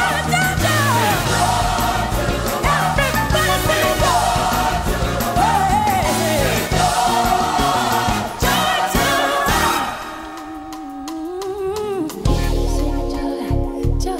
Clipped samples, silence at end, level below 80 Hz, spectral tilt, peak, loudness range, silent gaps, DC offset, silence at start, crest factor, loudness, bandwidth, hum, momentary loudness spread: under 0.1%; 0 s; -26 dBFS; -4 dB/octave; -6 dBFS; 6 LU; none; under 0.1%; 0 s; 12 dB; -18 LUFS; 16.5 kHz; none; 9 LU